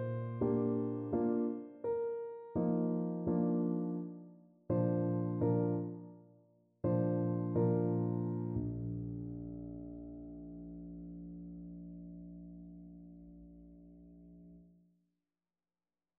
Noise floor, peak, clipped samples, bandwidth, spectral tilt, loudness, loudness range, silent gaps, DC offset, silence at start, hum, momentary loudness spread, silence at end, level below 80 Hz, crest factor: under -90 dBFS; -22 dBFS; under 0.1%; 2.8 kHz; -12.5 dB/octave; -36 LUFS; 17 LU; none; under 0.1%; 0 s; none; 22 LU; 1.55 s; -62 dBFS; 16 dB